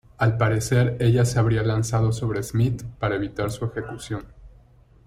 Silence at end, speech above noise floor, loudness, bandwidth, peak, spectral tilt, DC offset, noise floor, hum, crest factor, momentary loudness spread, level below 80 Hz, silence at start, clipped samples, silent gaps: 0.6 s; 31 dB; -23 LUFS; 14 kHz; -8 dBFS; -6.5 dB/octave; under 0.1%; -53 dBFS; none; 16 dB; 12 LU; -44 dBFS; 0.2 s; under 0.1%; none